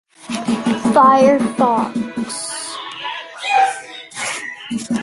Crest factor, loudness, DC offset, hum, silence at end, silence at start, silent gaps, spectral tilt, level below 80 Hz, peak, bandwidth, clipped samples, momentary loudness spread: 16 dB; -17 LUFS; under 0.1%; none; 0 s; 0.2 s; none; -4 dB/octave; -58 dBFS; -2 dBFS; 11.5 kHz; under 0.1%; 15 LU